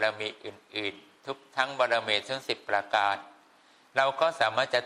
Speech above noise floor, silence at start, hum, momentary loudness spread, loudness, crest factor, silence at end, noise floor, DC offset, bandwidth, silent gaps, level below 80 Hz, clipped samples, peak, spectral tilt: 31 dB; 0 s; none; 12 LU; -29 LUFS; 22 dB; 0 s; -60 dBFS; under 0.1%; 13 kHz; none; -78 dBFS; under 0.1%; -8 dBFS; -2.5 dB/octave